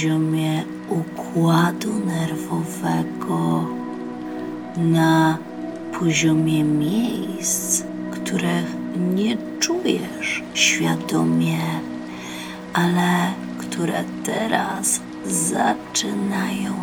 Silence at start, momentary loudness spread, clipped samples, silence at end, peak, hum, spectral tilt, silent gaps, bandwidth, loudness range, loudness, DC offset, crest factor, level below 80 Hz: 0 s; 12 LU; under 0.1%; 0 s; -2 dBFS; none; -4.5 dB/octave; none; 18.5 kHz; 2 LU; -22 LUFS; under 0.1%; 18 dB; -58 dBFS